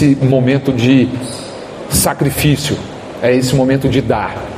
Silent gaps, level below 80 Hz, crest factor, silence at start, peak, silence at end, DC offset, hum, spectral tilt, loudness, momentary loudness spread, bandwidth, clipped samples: none; -36 dBFS; 14 dB; 0 s; 0 dBFS; 0 s; under 0.1%; none; -5.5 dB/octave; -13 LUFS; 13 LU; 15.5 kHz; under 0.1%